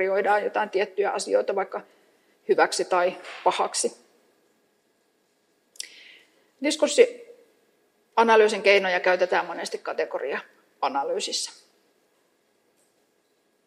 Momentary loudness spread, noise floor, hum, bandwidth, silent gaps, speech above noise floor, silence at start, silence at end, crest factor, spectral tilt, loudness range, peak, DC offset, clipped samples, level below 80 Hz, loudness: 14 LU; -68 dBFS; none; 13.5 kHz; none; 45 dB; 0 s; 2.15 s; 22 dB; -2 dB/octave; 9 LU; -4 dBFS; under 0.1%; under 0.1%; -86 dBFS; -24 LUFS